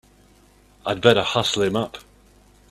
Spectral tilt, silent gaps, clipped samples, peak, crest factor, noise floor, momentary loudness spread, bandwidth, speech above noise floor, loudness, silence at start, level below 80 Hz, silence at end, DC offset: -4.5 dB/octave; none; under 0.1%; 0 dBFS; 24 dB; -54 dBFS; 15 LU; 14.5 kHz; 34 dB; -21 LUFS; 0.85 s; -54 dBFS; 0.7 s; under 0.1%